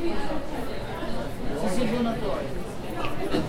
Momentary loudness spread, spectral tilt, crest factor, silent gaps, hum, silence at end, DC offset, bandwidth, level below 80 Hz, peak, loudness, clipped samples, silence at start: 7 LU; -6 dB/octave; 14 dB; none; none; 0 s; under 0.1%; 15.5 kHz; -38 dBFS; -12 dBFS; -30 LUFS; under 0.1%; 0 s